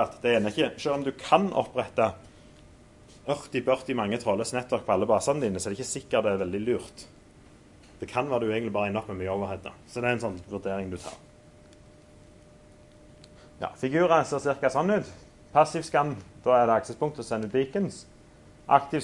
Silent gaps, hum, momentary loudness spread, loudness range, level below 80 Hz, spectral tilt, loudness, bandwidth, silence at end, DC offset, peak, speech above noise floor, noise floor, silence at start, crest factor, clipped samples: none; none; 12 LU; 8 LU; -60 dBFS; -5 dB/octave; -27 LUFS; 11.5 kHz; 0 s; under 0.1%; -4 dBFS; 26 dB; -53 dBFS; 0 s; 24 dB; under 0.1%